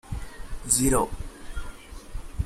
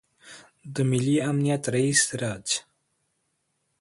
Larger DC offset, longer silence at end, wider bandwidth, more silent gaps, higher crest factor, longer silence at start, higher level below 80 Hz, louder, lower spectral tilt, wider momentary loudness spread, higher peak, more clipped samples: neither; second, 0 s vs 1.2 s; first, 16 kHz vs 11.5 kHz; neither; about the same, 24 dB vs 20 dB; second, 0.05 s vs 0.25 s; first, -36 dBFS vs -62 dBFS; about the same, -23 LUFS vs -24 LUFS; about the same, -4 dB/octave vs -4 dB/octave; first, 22 LU vs 9 LU; about the same, -4 dBFS vs -6 dBFS; neither